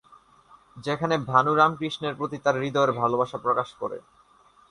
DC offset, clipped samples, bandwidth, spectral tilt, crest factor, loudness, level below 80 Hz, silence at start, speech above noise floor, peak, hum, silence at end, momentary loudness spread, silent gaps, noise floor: under 0.1%; under 0.1%; 11 kHz; -6 dB/octave; 22 dB; -25 LUFS; -64 dBFS; 0.75 s; 33 dB; -4 dBFS; none; 0.7 s; 13 LU; none; -58 dBFS